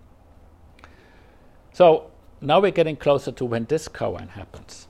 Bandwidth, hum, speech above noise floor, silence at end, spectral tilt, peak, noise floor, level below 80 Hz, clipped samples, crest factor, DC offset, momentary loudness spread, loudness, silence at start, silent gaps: 12 kHz; none; 30 dB; 0.1 s; -6 dB/octave; -2 dBFS; -51 dBFS; -52 dBFS; under 0.1%; 20 dB; under 0.1%; 20 LU; -21 LUFS; 1.75 s; none